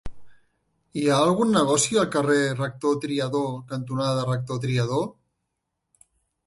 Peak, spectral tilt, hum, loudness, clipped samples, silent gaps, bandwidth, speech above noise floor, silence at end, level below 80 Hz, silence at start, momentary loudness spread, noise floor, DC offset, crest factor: -8 dBFS; -5 dB/octave; none; -24 LUFS; under 0.1%; none; 11.5 kHz; 57 dB; 1.35 s; -54 dBFS; 0.05 s; 9 LU; -80 dBFS; under 0.1%; 16 dB